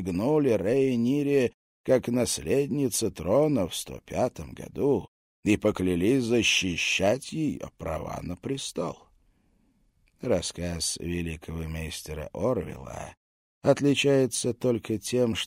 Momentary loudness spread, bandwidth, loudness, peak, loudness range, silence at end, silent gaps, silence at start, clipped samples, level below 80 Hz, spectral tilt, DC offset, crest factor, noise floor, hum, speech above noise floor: 13 LU; 16 kHz; -27 LUFS; -8 dBFS; 7 LU; 0 s; 1.54-1.84 s, 5.08-5.43 s, 13.17-13.61 s; 0 s; under 0.1%; -50 dBFS; -4.5 dB/octave; under 0.1%; 20 dB; -66 dBFS; none; 40 dB